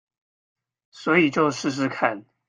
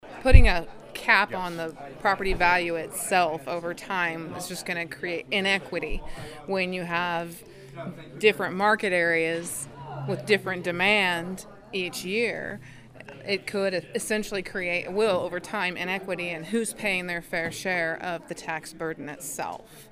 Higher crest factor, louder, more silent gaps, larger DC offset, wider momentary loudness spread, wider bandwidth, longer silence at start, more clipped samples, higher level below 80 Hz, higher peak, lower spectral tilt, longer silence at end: about the same, 22 dB vs 26 dB; first, -22 LUFS vs -26 LUFS; neither; neither; second, 7 LU vs 15 LU; second, 9.8 kHz vs 15.5 kHz; first, 0.95 s vs 0.05 s; neither; second, -68 dBFS vs -32 dBFS; second, -4 dBFS vs 0 dBFS; about the same, -5 dB/octave vs -4.5 dB/octave; first, 0.25 s vs 0.05 s